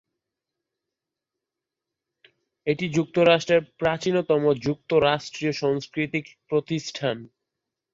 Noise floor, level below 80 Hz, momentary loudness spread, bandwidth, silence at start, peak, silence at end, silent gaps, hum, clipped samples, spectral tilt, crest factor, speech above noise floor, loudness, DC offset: -87 dBFS; -60 dBFS; 9 LU; 7.8 kHz; 2.65 s; -6 dBFS; 0.7 s; none; none; under 0.1%; -5.5 dB/octave; 20 dB; 63 dB; -24 LUFS; under 0.1%